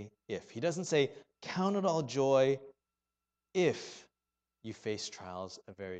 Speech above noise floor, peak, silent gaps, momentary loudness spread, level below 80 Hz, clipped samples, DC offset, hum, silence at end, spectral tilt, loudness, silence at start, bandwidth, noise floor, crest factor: over 56 dB; -16 dBFS; none; 18 LU; -76 dBFS; under 0.1%; under 0.1%; none; 0 s; -5 dB/octave; -34 LUFS; 0 s; 9 kHz; under -90 dBFS; 20 dB